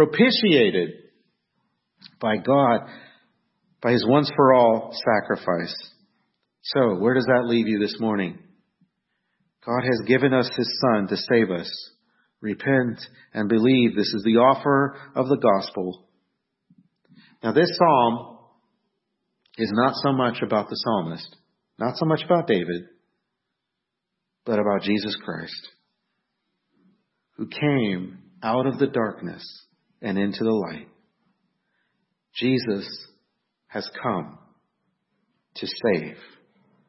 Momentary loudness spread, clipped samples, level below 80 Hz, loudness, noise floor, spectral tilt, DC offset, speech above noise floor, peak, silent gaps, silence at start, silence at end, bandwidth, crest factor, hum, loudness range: 18 LU; under 0.1%; -68 dBFS; -22 LUFS; -82 dBFS; -9 dB/octave; under 0.1%; 60 dB; -4 dBFS; none; 0 s; 0.75 s; 6 kHz; 20 dB; none; 9 LU